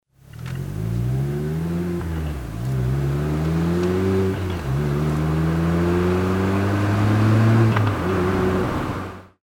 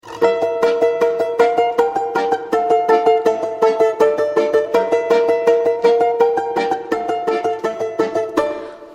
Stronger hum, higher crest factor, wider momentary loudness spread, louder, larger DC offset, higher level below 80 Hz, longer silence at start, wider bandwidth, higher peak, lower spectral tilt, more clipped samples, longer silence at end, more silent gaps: neither; about the same, 14 dB vs 16 dB; first, 10 LU vs 6 LU; second, -21 LUFS vs -17 LUFS; neither; first, -36 dBFS vs -60 dBFS; first, 0.35 s vs 0.05 s; first, 17 kHz vs 9.8 kHz; second, -6 dBFS vs -2 dBFS; first, -8 dB/octave vs -4.5 dB/octave; neither; first, 0.2 s vs 0 s; neither